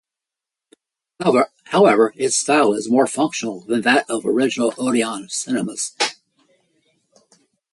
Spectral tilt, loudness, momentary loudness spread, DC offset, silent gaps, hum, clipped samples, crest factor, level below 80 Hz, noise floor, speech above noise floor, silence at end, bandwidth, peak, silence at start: -3.5 dB/octave; -18 LUFS; 8 LU; under 0.1%; none; none; under 0.1%; 18 dB; -66 dBFS; -87 dBFS; 69 dB; 1.6 s; 11.5 kHz; -2 dBFS; 1.2 s